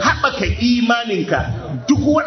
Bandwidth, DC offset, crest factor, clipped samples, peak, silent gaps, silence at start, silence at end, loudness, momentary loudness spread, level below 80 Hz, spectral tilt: 6.4 kHz; under 0.1%; 14 dB; under 0.1%; -2 dBFS; none; 0 s; 0 s; -17 LUFS; 6 LU; -32 dBFS; -5.5 dB/octave